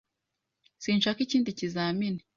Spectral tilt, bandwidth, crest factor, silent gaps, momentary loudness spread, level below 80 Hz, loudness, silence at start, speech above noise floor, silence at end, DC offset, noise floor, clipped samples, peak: -5 dB/octave; 7.4 kHz; 16 dB; none; 5 LU; -70 dBFS; -29 LUFS; 0.8 s; 56 dB; 0.2 s; under 0.1%; -84 dBFS; under 0.1%; -14 dBFS